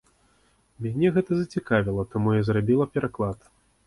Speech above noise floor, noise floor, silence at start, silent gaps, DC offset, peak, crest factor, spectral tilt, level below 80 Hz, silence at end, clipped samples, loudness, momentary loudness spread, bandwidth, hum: 40 dB; -64 dBFS; 0.8 s; none; under 0.1%; -8 dBFS; 16 dB; -8.5 dB/octave; -50 dBFS; 0.5 s; under 0.1%; -25 LUFS; 8 LU; 11.5 kHz; none